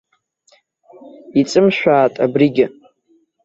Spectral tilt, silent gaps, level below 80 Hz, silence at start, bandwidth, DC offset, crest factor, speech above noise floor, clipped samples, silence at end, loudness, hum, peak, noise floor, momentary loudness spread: -6 dB/octave; none; -58 dBFS; 1.05 s; 8 kHz; under 0.1%; 16 dB; 45 dB; under 0.1%; 0.75 s; -15 LUFS; none; -2 dBFS; -59 dBFS; 6 LU